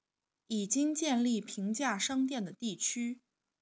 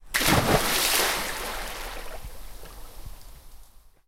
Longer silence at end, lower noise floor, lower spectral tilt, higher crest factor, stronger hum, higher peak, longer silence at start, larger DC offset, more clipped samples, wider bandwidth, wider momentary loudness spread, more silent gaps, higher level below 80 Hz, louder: first, 0.45 s vs 0.2 s; first, -79 dBFS vs -49 dBFS; about the same, -3 dB/octave vs -2.5 dB/octave; about the same, 18 dB vs 22 dB; neither; second, -16 dBFS vs -6 dBFS; first, 0.5 s vs 0 s; neither; neither; second, 8 kHz vs 17 kHz; second, 8 LU vs 24 LU; neither; second, -82 dBFS vs -40 dBFS; second, -33 LUFS vs -24 LUFS